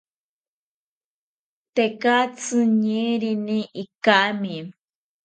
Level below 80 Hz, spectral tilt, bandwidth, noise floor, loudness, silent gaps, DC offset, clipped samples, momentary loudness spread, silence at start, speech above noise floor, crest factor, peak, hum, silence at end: -76 dBFS; -4.5 dB/octave; 9.2 kHz; under -90 dBFS; -21 LUFS; 3.95-4.01 s; under 0.1%; under 0.1%; 12 LU; 1.75 s; over 69 dB; 24 dB; 0 dBFS; none; 0.55 s